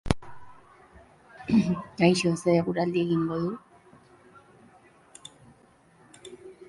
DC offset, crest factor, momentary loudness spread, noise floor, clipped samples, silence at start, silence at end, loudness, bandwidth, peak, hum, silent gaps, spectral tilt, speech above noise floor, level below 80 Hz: under 0.1%; 24 dB; 24 LU; -59 dBFS; under 0.1%; 0.05 s; 0.05 s; -26 LUFS; 11.5 kHz; -4 dBFS; none; none; -6.5 dB/octave; 34 dB; -50 dBFS